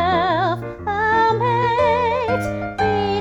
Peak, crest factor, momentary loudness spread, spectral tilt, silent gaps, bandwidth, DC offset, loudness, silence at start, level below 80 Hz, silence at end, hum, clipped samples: -6 dBFS; 12 dB; 6 LU; -6.5 dB/octave; none; 13 kHz; under 0.1%; -19 LUFS; 0 s; -42 dBFS; 0 s; none; under 0.1%